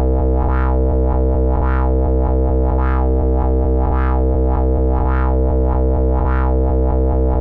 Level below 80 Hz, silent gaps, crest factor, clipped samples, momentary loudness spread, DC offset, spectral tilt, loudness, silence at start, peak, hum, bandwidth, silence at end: -16 dBFS; none; 6 dB; under 0.1%; 0 LU; 4%; -12.5 dB/octave; -17 LUFS; 0 s; -8 dBFS; none; 2.8 kHz; 0 s